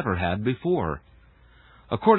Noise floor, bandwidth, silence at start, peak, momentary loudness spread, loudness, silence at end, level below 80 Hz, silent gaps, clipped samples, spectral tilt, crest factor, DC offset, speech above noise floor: -54 dBFS; 4.2 kHz; 0 s; -4 dBFS; 8 LU; -27 LUFS; 0 s; -44 dBFS; none; under 0.1%; -11.5 dB/octave; 20 dB; under 0.1%; 31 dB